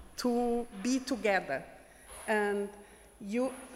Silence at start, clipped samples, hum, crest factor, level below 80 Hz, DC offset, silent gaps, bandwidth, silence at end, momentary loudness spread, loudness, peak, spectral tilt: 0 s; under 0.1%; none; 18 dB; -60 dBFS; under 0.1%; none; 16 kHz; 0 s; 17 LU; -33 LUFS; -16 dBFS; -4 dB/octave